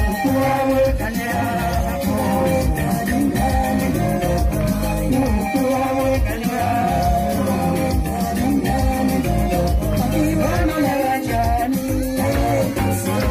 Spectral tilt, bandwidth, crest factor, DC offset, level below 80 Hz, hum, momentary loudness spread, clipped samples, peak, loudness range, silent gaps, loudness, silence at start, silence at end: -6 dB/octave; 15.5 kHz; 12 dB; under 0.1%; -26 dBFS; none; 3 LU; under 0.1%; -6 dBFS; 0 LU; none; -19 LUFS; 0 s; 0 s